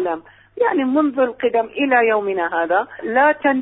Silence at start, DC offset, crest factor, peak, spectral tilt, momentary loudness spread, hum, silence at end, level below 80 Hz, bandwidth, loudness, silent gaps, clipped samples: 0 s; under 0.1%; 14 dB; -4 dBFS; -9.5 dB/octave; 6 LU; none; 0 s; -62 dBFS; 4 kHz; -18 LUFS; none; under 0.1%